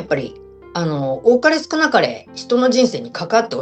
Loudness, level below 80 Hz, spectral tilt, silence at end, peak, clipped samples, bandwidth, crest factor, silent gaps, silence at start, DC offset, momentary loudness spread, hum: -17 LUFS; -56 dBFS; -4.5 dB/octave; 0 s; -2 dBFS; under 0.1%; 8.6 kHz; 16 dB; none; 0 s; under 0.1%; 12 LU; none